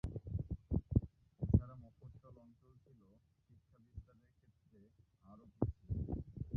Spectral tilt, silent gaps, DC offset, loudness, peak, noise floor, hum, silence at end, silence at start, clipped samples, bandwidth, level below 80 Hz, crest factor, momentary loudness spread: -13 dB/octave; none; under 0.1%; -40 LUFS; -16 dBFS; -72 dBFS; none; 0 s; 0.05 s; under 0.1%; 2.5 kHz; -50 dBFS; 26 dB; 24 LU